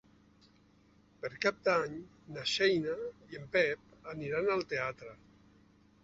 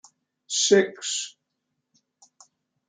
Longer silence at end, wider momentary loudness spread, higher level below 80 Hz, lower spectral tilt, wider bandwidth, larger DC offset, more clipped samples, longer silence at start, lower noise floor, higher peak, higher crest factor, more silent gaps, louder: second, 0.9 s vs 1.6 s; first, 18 LU vs 11 LU; first, -68 dBFS vs -76 dBFS; about the same, -2.5 dB/octave vs -2 dB/octave; second, 8 kHz vs 9.6 kHz; neither; neither; first, 1.25 s vs 0.5 s; second, -65 dBFS vs -80 dBFS; second, -16 dBFS vs -4 dBFS; about the same, 20 dB vs 22 dB; neither; second, -33 LUFS vs -23 LUFS